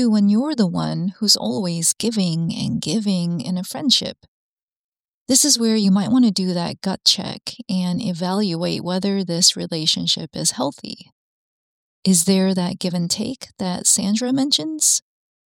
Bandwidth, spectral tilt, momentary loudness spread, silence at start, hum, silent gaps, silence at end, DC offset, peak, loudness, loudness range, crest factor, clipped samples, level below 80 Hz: 16.5 kHz; -3.5 dB/octave; 9 LU; 0 s; none; 4.28-4.96 s, 5.04-5.26 s, 11.12-12.03 s; 0.5 s; under 0.1%; 0 dBFS; -19 LUFS; 3 LU; 20 dB; under 0.1%; -60 dBFS